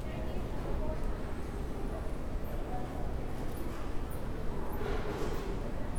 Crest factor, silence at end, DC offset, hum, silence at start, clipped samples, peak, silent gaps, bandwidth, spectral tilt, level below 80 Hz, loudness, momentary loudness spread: 12 dB; 0 s; under 0.1%; none; 0 s; under 0.1%; -22 dBFS; none; 17 kHz; -7 dB/octave; -38 dBFS; -39 LUFS; 3 LU